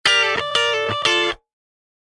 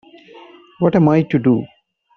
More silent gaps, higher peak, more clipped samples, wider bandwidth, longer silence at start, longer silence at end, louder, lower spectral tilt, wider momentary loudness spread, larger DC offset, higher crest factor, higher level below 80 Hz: neither; about the same, 0 dBFS vs -2 dBFS; neither; first, 11.5 kHz vs 6.4 kHz; second, 0.05 s vs 0.8 s; first, 0.8 s vs 0.5 s; about the same, -18 LUFS vs -16 LUFS; second, -1.5 dB/octave vs -8.5 dB/octave; about the same, 6 LU vs 7 LU; neither; about the same, 20 dB vs 16 dB; about the same, -56 dBFS vs -54 dBFS